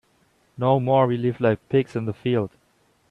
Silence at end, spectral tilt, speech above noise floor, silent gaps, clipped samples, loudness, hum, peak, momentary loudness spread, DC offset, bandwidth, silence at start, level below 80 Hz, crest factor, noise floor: 0.65 s; -9 dB/octave; 42 dB; none; under 0.1%; -22 LUFS; none; -6 dBFS; 8 LU; under 0.1%; 6.8 kHz; 0.6 s; -60 dBFS; 18 dB; -63 dBFS